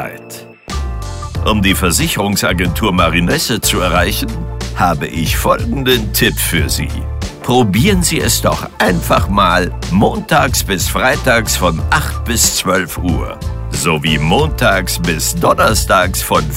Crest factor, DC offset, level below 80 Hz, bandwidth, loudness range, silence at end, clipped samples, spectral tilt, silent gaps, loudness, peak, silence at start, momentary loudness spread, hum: 14 dB; under 0.1%; -24 dBFS; 16.5 kHz; 2 LU; 0 s; under 0.1%; -4 dB/octave; none; -13 LUFS; 0 dBFS; 0 s; 11 LU; none